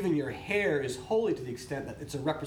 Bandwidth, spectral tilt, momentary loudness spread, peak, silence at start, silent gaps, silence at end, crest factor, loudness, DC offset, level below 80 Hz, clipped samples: 17 kHz; -5.5 dB/octave; 9 LU; -16 dBFS; 0 s; none; 0 s; 14 dB; -32 LUFS; under 0.1%; -58 dBFS; under 0.1%